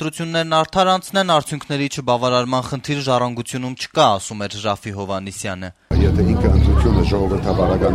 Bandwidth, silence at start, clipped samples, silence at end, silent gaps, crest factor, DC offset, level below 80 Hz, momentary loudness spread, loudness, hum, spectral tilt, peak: 14 kHz; 0 s; under 0.1%; 0 s; none; 16 dB; under 0.1%; -26 dBFS; 10 LU; -18 LUFS; none; -5.5 dB/octave; -2 dBFS